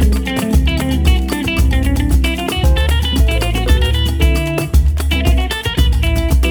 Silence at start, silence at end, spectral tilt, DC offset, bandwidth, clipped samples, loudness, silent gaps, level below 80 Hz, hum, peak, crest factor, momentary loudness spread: 0 s; 0 s; -5.5 dB/octave; under 0.1%; 20 kHz; under 0.1%; -15 LUFS; none; -14 dBFS; none; 0 dBFS; 12 dB; 2 LU